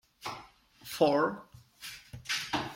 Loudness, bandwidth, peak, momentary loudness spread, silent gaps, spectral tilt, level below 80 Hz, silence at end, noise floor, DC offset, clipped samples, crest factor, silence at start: -31 LUFS; 16.5 kHz; -12 dBFS; 20 LU; none; -4 dB/octave; -66 dBFS; 0 s; -55 dBFS; under 0.1%; under 0.1%; 22 dB; 0.2 s